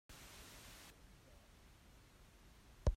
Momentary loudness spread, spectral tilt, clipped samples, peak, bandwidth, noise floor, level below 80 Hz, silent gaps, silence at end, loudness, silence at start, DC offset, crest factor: 9 LU; -5.5 dB/octave; under 0.1%; -24 dBFS; 16 kHz; -64 dBFS; -50 dBFS; none; 0 s; -56 LUFS; 0.1 s; under 0.1%; 24 dB